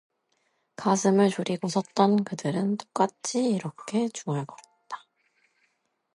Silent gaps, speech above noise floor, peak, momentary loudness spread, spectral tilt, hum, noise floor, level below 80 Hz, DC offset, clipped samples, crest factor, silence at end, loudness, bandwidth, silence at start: none; 48 dB; -6 dBFS; 16 LU; -5.5 dB/octave; none; -74 dBFS; -76 dBFS; under 0.1%; under 0.1%; 22 dB; 1.15 s; -26 LUFS; 11.5 kHz; 0.8 s